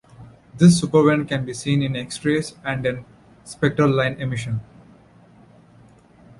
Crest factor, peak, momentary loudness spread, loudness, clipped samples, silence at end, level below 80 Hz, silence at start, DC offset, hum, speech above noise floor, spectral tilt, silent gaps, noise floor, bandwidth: 20 dB; -2 dBFS; 12 LU; -20 LUFS; under 0.1%; 1.75 s; -52 dBFS; 0.2 s; under 0.1%; none; 31 dB; -6 dB/octave; none; -50 dBFS; 11.5 kHz